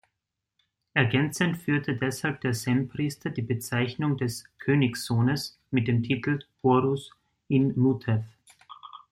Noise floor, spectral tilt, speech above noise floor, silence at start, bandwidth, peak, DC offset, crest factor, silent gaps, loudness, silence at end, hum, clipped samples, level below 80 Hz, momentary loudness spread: -84 dBFS; -6 dB/octave; 58 dB; 0.95 s; 16 kHz; -8 dBFS; under 0.1%; 18 dB; none; -27 LUFS; 0.15 s; none; under 0.1%; -62 dBFS; 8 LU